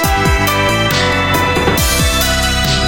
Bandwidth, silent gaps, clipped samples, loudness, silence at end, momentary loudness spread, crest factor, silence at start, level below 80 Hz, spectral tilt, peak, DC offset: 17 kHz; none; under 0.1%; -12 LUFS; 0 s; 1 LU; 12 dB; 0 s; -22 dBFS; -3.5 dB/octave; 0 dBFS; under 0.1%